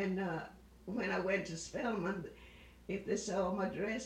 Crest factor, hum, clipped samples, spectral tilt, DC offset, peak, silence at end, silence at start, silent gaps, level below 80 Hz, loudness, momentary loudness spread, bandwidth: 16 dB; none; under 0.1%; -5 dB/octave; under 0.1%; -22 dBFS; 0 s; 0 s; none; -62 dBFS; -38 LUFS; 17 LU; 12 kHz